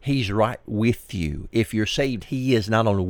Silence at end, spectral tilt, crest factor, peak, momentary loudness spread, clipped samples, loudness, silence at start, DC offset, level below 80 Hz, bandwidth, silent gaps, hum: 0 s; -6 dB/octave; 16 dB; -6 dBFS; 6 LU; under 0.1%; -23 LUFS; 0.05 s; under 0.1%; -42 dBFS; 19 kHz; none; none